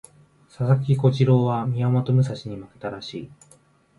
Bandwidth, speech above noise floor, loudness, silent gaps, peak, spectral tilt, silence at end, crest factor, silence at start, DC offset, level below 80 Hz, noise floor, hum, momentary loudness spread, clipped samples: 11 kHz; 35 dB; -21 LUFS; none; -6 dBFS; -8.5 dB/octave; 0.65 s; 16 dB; 0.6 s; under 0.1%; -58 dBFS; -56 dBFS; none; 15 LU; under 0.1%